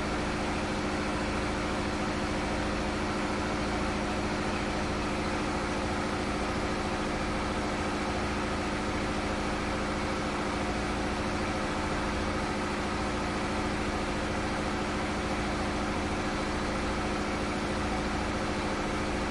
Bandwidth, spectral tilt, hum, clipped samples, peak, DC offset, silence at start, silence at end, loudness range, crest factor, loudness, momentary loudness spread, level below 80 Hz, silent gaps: 11.5 kHz; -5 dB/octave; none; under 0.1%; -18 dBFS; under 0.1%; 0 s; 0 s; 0 LU; 12 dB; -31 LUFS; 0 LU; -42 dBFS; none